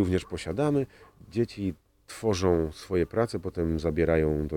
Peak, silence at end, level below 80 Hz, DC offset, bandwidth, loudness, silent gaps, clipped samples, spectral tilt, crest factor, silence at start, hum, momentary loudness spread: -10 dBFS; 0 s; -46 dBFS; under 0.1%; 17.5 kHz; -28 LUFS; none; under 0.1%; -7 dB/octave; 16 dB; 0 s; none; 9 LU